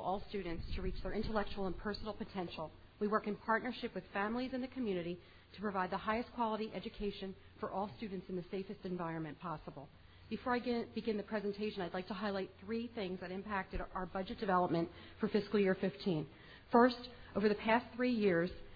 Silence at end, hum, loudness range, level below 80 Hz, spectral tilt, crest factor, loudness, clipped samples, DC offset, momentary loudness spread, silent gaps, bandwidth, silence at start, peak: 0 s; none; 7 LU; -54 dBFS; -4.5 dB/octave; 24 dB; -39 LUFS; under 0.1%; under 0.1%; 12 LU; none; 5 kHz; 0 s; -16 dBFS